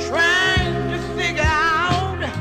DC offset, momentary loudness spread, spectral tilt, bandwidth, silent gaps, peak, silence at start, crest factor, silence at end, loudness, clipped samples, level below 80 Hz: under 0.1%; 8 LU; -4.5 dB/octave; 14 kHz; none; -6 dBFS; 0 s; 14 dB; 0 s; -18 LUFS; under 0.1%; -32 dBFS